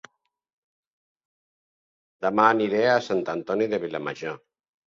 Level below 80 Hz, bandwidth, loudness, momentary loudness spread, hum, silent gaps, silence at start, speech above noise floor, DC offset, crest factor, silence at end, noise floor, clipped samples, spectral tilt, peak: -70 dBFS; 7.4 kHz; -24 LUFS; 14 LU; none; none; 2.2 s; over 67 dB; under 0.1%; 24 dB; 0.5 s; under -90 dBFS; under 0.1%; -5.5 dB/octave; -4 dBFS